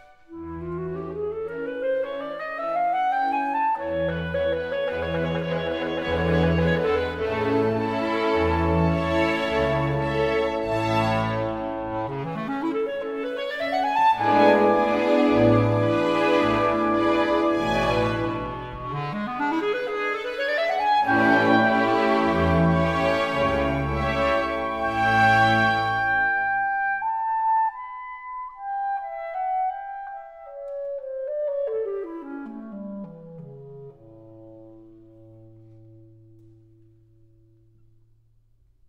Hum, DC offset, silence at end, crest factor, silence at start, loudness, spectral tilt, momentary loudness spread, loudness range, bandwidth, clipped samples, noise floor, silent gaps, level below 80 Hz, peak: none; under 0.1%; 2.9 s; 20 dB; 0.3 s; -23 LUFS; -7 dB/octave; 16 LU; 11 LU; 14 kHz; under 0.1%; -60 dBFS; none; -44 dBFS; -4 dBFS